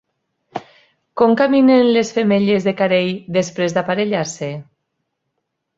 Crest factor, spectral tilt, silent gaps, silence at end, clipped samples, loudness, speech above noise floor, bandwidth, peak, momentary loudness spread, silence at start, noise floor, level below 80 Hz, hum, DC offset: 16 dB; -5.5 dB/octave; none; 1.15 s; under 0.1%; -16 LUFS; 59 dB; 7.8 kHz; 0 dBFS; 20 LU; 0.55 s; -74 dBFS; -60 dBFS; none; under 0.1%